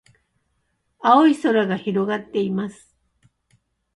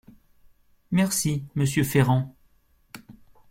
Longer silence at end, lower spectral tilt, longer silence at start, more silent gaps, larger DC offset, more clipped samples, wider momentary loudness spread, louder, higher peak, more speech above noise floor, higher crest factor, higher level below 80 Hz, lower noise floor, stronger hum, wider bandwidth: first, 1.25 s vs 0.4 s; about the same, -6.5 dB/octave vs -5.5 dB/octave; first, 1.05 s vs 0.9 s; neither; neither; neither; second, 11 LU vs 24 LU; first, -19 LUFS vs -24 LUFS; first, -2 dBFS vs -6 dBFS; first, 52 dB vs 39 dB; about the same, 20 dB vs 20 dB; second, -66 dBFS vs -54 dBFS; first, -71 dBFS vs -62 dBFS; neither; second, 11.5 kHz vs 16.5 kHz